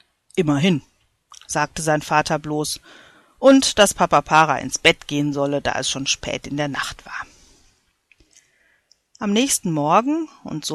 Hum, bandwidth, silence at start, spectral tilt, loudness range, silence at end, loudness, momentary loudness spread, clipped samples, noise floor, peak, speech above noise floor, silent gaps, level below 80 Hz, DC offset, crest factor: none; 13.5 kHz; 0.35 s; -3.5 dB/octave; 9 LU; 0 s; -19 LUFS; 14 LU; under 0.1%; -61 dBFS; 0 dBFS; 42 dB; none; -50 dBFS; under 0.1%; 20 dB